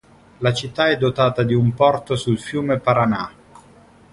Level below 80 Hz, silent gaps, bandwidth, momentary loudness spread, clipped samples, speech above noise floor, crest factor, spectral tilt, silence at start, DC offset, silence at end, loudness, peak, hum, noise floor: -50 dBFS; none; 11.5 kHz; 5 LU; under 0.1%; 30 dB; 18 dB; -6.5 dB/octave; 0.4 s; under 0.1%; 0.8 s; -19 LUFS; -2 dBFS; none; -48 dBFS